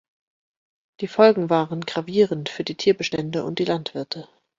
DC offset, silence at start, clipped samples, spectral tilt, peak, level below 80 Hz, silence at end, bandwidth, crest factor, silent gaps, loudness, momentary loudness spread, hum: under 0.1%; 1 s; under 0.1%; -6 dB/octave; -2 dBFS; -64 dBFS; 0.35 s; 7.6 kHz; 20 dB; none; -22 LUFS; 14 LU; none